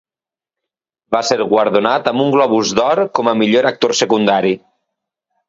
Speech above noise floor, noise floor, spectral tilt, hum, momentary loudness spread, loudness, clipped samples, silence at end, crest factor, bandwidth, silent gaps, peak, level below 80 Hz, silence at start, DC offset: over 76 dB; under -90 dBFS; -4 dB/octave; none; 4 LU; -14 LUFS; under 0.1%; 0.9 s; 16 dB; 7.8 kHz; none; 0 dBFS; -58 dBFS; 1.1 s; under 0.1%